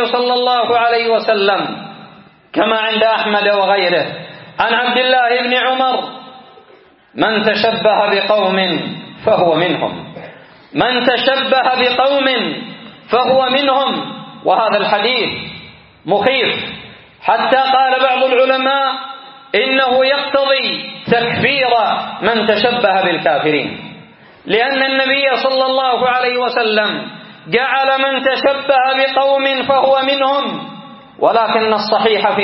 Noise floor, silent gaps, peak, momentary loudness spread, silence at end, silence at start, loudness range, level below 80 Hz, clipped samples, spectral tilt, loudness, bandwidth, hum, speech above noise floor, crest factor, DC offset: -46 dBFS; none; 0 dBFS; 13 LU; 0 s; 0 s; 2 LU; -58 dBFS; under 0.1%; -1 dB/octave; -14 LUFS; 5.8 kHz; none; 32 dB; 14 dB; under 0.1%